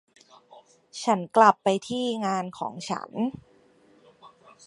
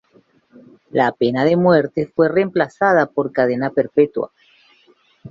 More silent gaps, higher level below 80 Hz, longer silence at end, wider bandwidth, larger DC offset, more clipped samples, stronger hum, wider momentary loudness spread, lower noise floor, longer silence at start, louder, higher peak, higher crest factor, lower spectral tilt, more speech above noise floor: neither; second, -70 dBFS vs -60 dBFS; first, 0.4 s vs 0 s; first, 11.5 kHz vs 7.4 kHz; neither; neither; neither; first, 15 LU vs 6 LU; about the same, -59 dBFS vs -56 dBFS; about the same, 0.95 s vs 0.95 s; second, -25 LUFS vs -17 LUFS; about the same, -4 dBFS vs -2 dBFS; first, 24 dB vs 16 dB; second, -5 dB/octave vs -8 dB/octave; second, 34 dB vs 39 dB